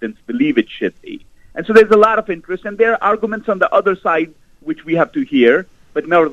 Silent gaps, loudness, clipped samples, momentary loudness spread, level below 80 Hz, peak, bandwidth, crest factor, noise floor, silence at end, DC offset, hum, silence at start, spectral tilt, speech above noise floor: none; -15 LUFS; 0.1%; 16 LU; -52 dBFS; 0 dBFS; 8.4 kHz; 16 dB; -34 dBFS; 0 s; under 0.1%; none; 0 s; -6.5 dB/octave; 20 dB